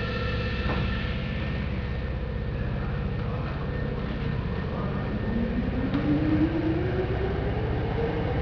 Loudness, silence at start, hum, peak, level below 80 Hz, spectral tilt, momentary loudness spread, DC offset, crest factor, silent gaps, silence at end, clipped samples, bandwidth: -29 LUFS; 0 s; none; -12 dBFS; -34 dBFS; -9 dB/octave; 6 LU; under 0.1%; 14 dB; none; 0 s; under 0.1%; 5.4 kHz